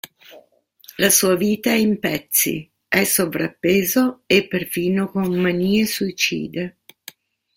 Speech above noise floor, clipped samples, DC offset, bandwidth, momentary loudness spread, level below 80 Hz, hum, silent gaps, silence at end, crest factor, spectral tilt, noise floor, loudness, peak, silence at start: 34 dB; under 0.1%; under 0.1%; 16.5 kHz; 10 LU; -56 dBFS; none; none; 0.85 s; 20 dB; -3.5 dB/octave; -53 dBFS; -19 LUFS; -2 dBFS; 0.3 s